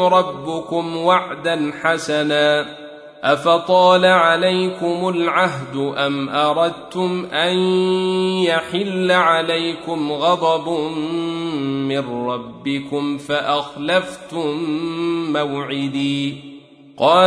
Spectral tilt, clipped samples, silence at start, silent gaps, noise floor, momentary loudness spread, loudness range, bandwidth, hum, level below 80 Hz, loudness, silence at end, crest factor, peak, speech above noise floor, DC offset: -5 dB/octave; under 0.1%; 0 s; none; -41 dBFS; 9 LU; 6 LU; 11 kHz; none; -62 dBFS; -18 LUFS; 0 s; 16 dB; -2 dBFS; 23 dB; under 0.1%